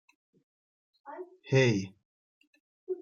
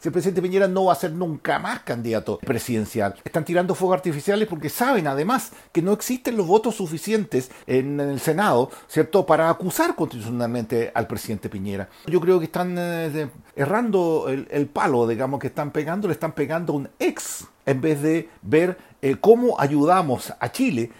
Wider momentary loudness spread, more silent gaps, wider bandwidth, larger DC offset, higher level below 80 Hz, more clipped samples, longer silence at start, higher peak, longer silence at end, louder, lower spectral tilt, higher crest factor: first, 20 LU vs 8 LU; first, 2.05-2.41 s, 2.47-2.53 s, 2.60-2.87 s vs none; second, 7.2 kHz vs 16.5 kHz; neither; second, -70 dBFS vs -58 dBFS; neither; first, 1.05 s vs 0 s; second, -12 dBFS vs -2 dBFS; about the same, 0 s vs 0.05 s; second, -28 LUFS vs -22 LUFS; about the same, -6 dB/octave vs -6 dB/octave; about the same, 22 dB vs 20 dB